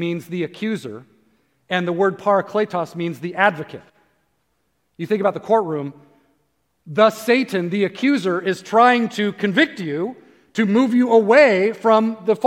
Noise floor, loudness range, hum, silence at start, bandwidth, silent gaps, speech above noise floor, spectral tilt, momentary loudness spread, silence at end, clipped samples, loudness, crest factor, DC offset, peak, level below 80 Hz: -69 dBFS; 6 LU; none; 0 s; 16.5 kHz; none; 51 dB; -6 dB/octave; 13 LU; 0 s; under 0.1%; -18 LUFS; 18 dB; under 0.1%; 0 dBFS; -74 dBFS